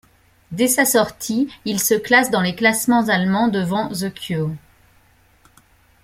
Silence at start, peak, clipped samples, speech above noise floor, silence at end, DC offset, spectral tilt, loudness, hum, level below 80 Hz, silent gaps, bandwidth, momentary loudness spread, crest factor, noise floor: 0.5 s; -2 dBFS; under 0.1%; 37 dB; 1.45 s; under 0.1%; -4 dB/octave; -18 LUFS; none; -56 dBFS; none; 16.5 kHz; 10 LU; 18 dB; -55 dBFS